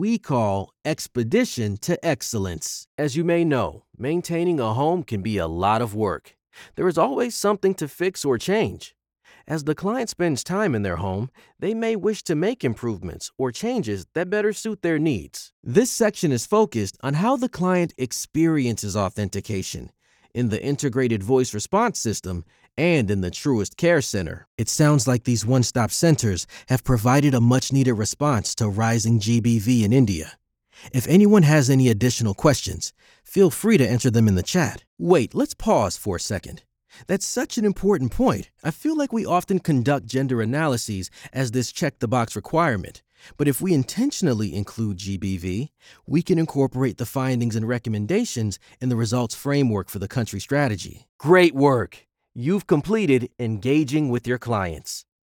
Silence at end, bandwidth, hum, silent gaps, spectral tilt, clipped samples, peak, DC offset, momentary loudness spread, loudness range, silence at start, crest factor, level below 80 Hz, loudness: 0.2 s; 19 kHz; none; 2.87-2.98 s, 15.53-15.63 s, 24.47-24.58 s, 34.87-34.97 s, 51.09-51.19 s; -5.5 dB/octave; under 0.1%; -4 dBFS; under 0.1%; 10 LU; 5 LU; 0 s; 18 dB; -50 dBFS; -22 LUFS